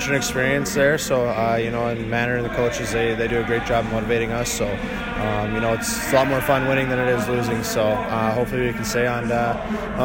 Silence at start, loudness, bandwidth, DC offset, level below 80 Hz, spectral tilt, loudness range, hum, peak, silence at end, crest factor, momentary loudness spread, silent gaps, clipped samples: 0 s; -21 LUFS; 17 kHz; under 0.1%; -38 dBFS; -4.5 dB/octave; 2 LU; none; -4 dBFS; 0 s; 18 dB; 5 LU; none; under 0.1%